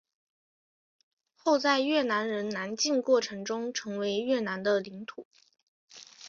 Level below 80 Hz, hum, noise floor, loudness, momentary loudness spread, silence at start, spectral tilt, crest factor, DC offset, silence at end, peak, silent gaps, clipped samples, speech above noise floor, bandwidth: -78 dBFS; none; under -90 dBFS; -29 LUFS; 16 LU; 1.45 s; -3.5 dB/octave; 20 dB; under 0.1%; 0 s; -12 dBFS; 5.25-5.31 s, 5.63-5.88 s; under 0.1%; over 61 dB; 7.6 kHz